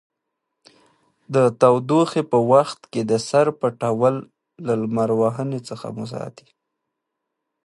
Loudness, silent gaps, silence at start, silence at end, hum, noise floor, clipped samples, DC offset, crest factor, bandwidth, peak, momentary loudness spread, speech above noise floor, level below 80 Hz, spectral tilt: -20 LUFS; none; 1.3 s; 1.35 s; none; -80 dBFS; under 0.1%; under 0.1%; 20 dB; 11.5 kHz; -2 dBFS; 15 LU; 60 dB; -66 dBFS; -6.5 dB/octave